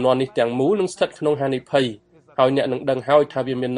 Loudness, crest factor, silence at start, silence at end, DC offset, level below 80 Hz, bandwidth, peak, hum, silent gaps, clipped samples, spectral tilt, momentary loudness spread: -20 LUFS; 18 dB; 0 s; 0 s; under 0.1%; -60 dBFS; 10.5 kHz; -2 dBFS; none; none; under 0.1%; -6 dB/octave; 6 LU